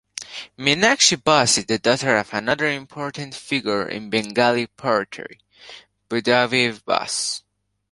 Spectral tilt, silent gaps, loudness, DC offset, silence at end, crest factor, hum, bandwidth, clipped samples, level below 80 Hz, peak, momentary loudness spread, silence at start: -2.5 dB/octave; none; -20 LUFS; under 0.1%; 0.5 s; 20 dB; none; 11.5 kHz; under 0.1%; -60 dBFS; 0 dBFS; 16 LU; 0.15 s